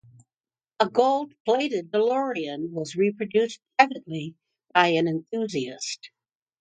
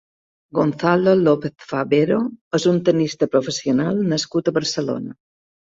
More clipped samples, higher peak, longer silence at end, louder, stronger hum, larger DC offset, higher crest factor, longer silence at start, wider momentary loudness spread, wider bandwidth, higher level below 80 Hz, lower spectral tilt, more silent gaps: neither; about the same, -2 dBFS vs -2 dBFS; about the same, 0.55 s vs 0.65 s; second, -25 LUFS vs -19 LUFS; neither; neither; first, 24 dB vs 16 dB; first, 0.8 s vs 0.55 s; about the same, 12 LU vs 10 LU; first, 9.4 kHz vs 8 kHz; second, -74 dBFS vs -60 dBFS; about the same, -4.5 dB/octave vs -5.5 dB/octave; about the same, 1.40-1.45 s vs 2.41-2.51 s